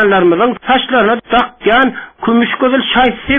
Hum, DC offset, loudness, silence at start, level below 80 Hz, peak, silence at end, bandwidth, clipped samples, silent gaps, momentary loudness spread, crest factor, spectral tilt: none; under 0.1%; -12 LUFS; 0 s; -38 dBFS; 0 dBFS; 0 s; 3.9 kHz; under 0.1%; none; 4 LU; 10 dB; -7.5 dB/octave